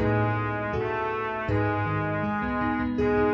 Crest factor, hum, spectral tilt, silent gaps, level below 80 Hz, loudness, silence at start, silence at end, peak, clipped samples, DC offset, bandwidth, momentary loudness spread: 14 dB; none; -9 dB/octave; none; -44 dBFS; -27 LUFS; 0 s; 0 s; -12 dBFS; under 0.1%; under 0.1%; 6.4 kHz; 4 LU